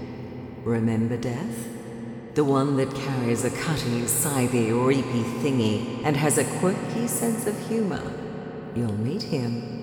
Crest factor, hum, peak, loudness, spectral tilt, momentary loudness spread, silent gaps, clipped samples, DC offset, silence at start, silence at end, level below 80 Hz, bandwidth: 18 dB; none; -8 dBFS; -25 LUFS; -5.5 dB/octave; 12 LU; none; under 0.1%; under 0.1%; 0 s; 0 s; -54 dBFS; 20 kHz